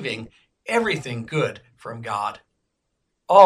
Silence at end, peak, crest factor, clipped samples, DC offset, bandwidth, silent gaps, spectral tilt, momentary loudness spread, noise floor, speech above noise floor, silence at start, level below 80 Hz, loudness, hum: 0 s; 0 dBFS; 22 dB; under 0.1%; under 0.1%; 14.5 kHz; none; -5 dB/octave; 17 LU; -76 dBFS; 50 dB; 0 s; -62 dBFS; -25 LUFS; none